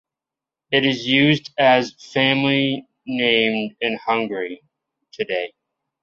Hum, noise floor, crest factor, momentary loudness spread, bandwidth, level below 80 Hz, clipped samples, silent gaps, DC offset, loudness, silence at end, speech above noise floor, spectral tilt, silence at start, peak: none; -88 dBFS; 20 dB; 13 LU; 7.4 kHz; -64 dBFS; under 0.1%; none; under 0.1%; -19 LUFS; 0.55 s; 68 dB; -5.5 dB/octave; 0.7 s; -2 dBFS